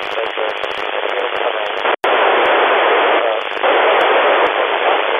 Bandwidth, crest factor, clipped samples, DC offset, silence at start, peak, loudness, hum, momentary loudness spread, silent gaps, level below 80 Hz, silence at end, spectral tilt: 11 kHz; 14 dB; under 0.1%; under 0.1%; 0 s; -2 dBFS; -14 LUFS; none; 8 LU; none; -62 dBFS; 0 s; -3 dB/octave